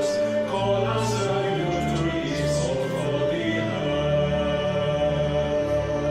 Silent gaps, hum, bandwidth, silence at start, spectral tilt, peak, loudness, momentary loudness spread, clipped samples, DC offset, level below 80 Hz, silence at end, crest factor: none; none; 13.5 kHz; 0 s; -6 dB/octave; -10 dBFS; -24 LUFS; 2 LU; under 0.1%; under 0.1%; -42 dBFS; 0 s; 12 dB